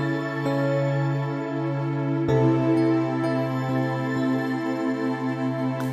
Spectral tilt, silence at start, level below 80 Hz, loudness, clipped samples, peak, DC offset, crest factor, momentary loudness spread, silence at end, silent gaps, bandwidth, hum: -8.5 dB/octave; 0 s; -58 dBFS; -24 LUFS; under 0.1%; -8 dBFS; under 0.1%; 14 dB; 6 LU; 0 s; none; 12 kHz; none